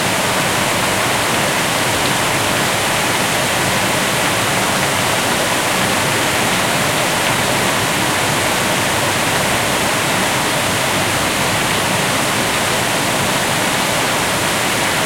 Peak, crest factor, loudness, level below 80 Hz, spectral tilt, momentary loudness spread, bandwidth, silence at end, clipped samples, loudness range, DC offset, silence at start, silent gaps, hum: -4 dBFS; 12 dB; -15 LUFS; -42 dBFS; -2.5 dB/octave; 1 LU; 16.5 kHz; 0 s; under 0.1%; 0 LU; under 0.1%; 0 s; none; none